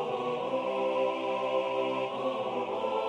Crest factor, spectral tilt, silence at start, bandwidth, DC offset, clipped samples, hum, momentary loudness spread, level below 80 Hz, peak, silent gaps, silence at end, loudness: 12 dB; -5.5 dB/octave; 0 s; 9.6 kHz; under 0.1%; under 0.1%; none; 3 LU; -76 dBFS; -18 dBFS; none; 0 s; -31 LUFS